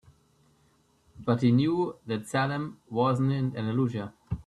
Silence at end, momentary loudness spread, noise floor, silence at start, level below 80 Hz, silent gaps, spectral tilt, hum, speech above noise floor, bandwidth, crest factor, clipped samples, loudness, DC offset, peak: 0.05 s; 11 LU; -66 dBFS; 1.15 s; -56 dBFS; none; -7.5 dB/octave; none; 39 dB; 12 kHz; 18 dB; under 0.1%; -28 LUFS; under 0.1%; -12 dBFS